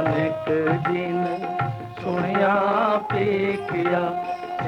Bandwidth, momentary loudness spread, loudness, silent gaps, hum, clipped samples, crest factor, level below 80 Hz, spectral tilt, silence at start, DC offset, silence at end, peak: 10.5 kHz; 8 LU; -23 LUFS; none; none; under 0.1%; 14 dB; -58 dBFS; -8 dB/octave; 0 s; under 0.1%; 0 s; -8 dBFS